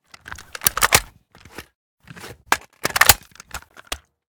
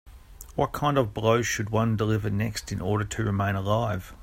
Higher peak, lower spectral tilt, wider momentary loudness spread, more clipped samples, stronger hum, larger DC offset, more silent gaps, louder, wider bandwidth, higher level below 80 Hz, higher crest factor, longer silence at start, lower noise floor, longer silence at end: first, 0 dBFS vs -8 dBFS; second, -0.5 dB/octave vs -6 dB/octave; first, 25 LU vs 6 LU; first, 0.1% vs under 0.1%; neither; neither; first, 1.75-1.97 s vs none; first, -17 LUFS vs -26 LUFS; first, over 20 kHz vs 16 kHz; about the same, -42 dBFS vs -46 dBFS; first, 24 dB vs 18 dB; first, 0.3 s vs 0.05 s; about the same, -48 dBFS vs -46 dBFS; first, 0.4 s vs 0 s